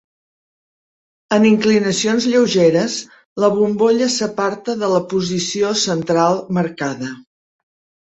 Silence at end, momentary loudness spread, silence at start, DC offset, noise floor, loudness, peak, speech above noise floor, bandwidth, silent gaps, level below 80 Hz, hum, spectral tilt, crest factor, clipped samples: 0.8 s; 9 LU; 1.3 s; under 0.1%; under -90 dBFS; -17 LUFS; -2 dBFS; over 74 dB; 8.2 kHz; 3.25-3.36 s; -58 dBFS; none; -4.5 dB/octave; 16 dB; under 0.1%